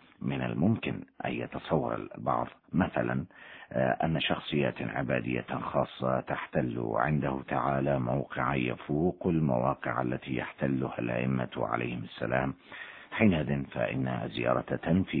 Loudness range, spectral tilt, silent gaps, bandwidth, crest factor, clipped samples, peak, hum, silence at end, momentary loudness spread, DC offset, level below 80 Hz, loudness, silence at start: 2 LU; -10.5 dB/octave; none; 4.5 kHz; 22 dB; under 0.1%; -10 dBFS; none; 0 s; 7 LU; under 0.1%; -54 dBFS; -31 LUFS; 0.2 s